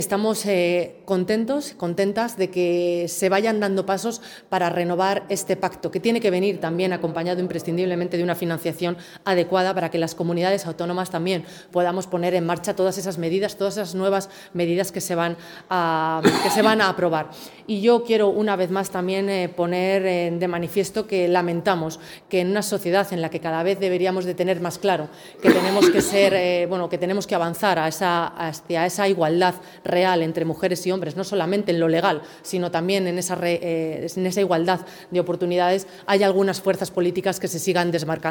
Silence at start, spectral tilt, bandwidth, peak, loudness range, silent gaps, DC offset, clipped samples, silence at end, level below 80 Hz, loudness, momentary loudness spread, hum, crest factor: 0 s; -5 dB/octave; 18 kHz; 0 dBFS; 4 LU; none; under 0.1%; under 0.1%; 0 s; -62 dBFS; -22 LUFS; 7 LU; none; 22 dB